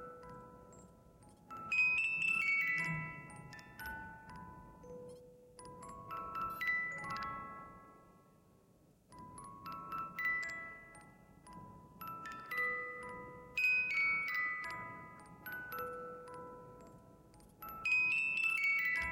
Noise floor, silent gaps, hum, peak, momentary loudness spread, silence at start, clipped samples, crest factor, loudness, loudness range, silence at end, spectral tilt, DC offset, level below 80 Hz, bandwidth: -68 dBFS; none; none; -24 dBFS; 24 LU; 0 s; under 0.1%; 18 dB; -36 LUFS; 12 LU; 0 s; -3.5 dB/octave; under 0.1%; -68 dBFS; 16.5 kHz